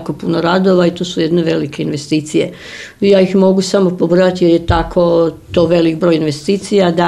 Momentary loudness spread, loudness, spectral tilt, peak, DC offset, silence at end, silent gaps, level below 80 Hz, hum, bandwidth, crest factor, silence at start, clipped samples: 7 LU; -13 LUFS; -6.5 dB/octave; 0 dBFS; under 0.1%; 0 s; none; -34 dBFS; none; 12 kHz; 12 dB; 0 s; under 0.1%